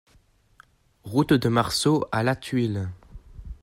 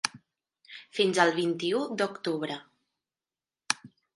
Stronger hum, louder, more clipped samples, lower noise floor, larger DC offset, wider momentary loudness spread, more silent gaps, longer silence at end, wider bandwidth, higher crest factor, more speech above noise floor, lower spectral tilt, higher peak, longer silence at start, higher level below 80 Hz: neither; first, -24 LUFS vs -29 LUFS; neither; second, -60 dBFS vs under -90 dBFS; neither; about the same, 14 LU vs 15 LU; neither; second, 0.1 s vs 0.3 s; first, 16 kHz vs 11.5 kHz; second, 20 dB vs 28 dB; second, 37 dB vs over 62 dB; first, -5.5 dB/octave vs -3.5 dB/octave; second, -6 dBFS vs -2 dBFS; first, 1.05 s vs 0.05 s; first, -48 dBFS vs -80 dBFS